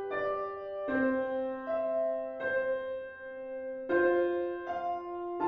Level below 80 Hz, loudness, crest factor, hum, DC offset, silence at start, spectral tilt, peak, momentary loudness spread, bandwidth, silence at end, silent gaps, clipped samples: -68 dBFS; -33 LUFS; 16 dB; none; under 0.1%; 0 s; -7.5 dB/octave; -16 dBFS; 11 LU; 5.2 kHz; 0 s; none; under 0.1%